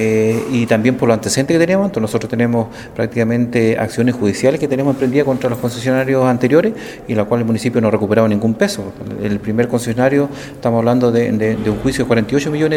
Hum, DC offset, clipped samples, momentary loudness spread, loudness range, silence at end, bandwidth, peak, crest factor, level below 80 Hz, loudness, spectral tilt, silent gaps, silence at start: none; under 0.1%; under 0.1%; 7 LU; 1 LU; 0 s; 16.5 kHz; 0 dBFS; 14 dB; -44 dBFS; -16 LUFS; -6.5 dB/octave; none; 0 s